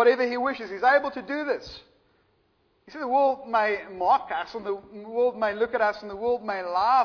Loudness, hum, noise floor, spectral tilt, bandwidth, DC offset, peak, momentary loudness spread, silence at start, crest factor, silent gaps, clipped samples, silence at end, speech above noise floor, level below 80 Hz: -26 LUFS; none; -67 dBFS; -5 dB/octave; 5.4 kHz; under 0.1%; -8 dBFS; 12 LU; 0 s; 18 dB; none; under 0.1%; 0 s; 42 dB; -62 dBFS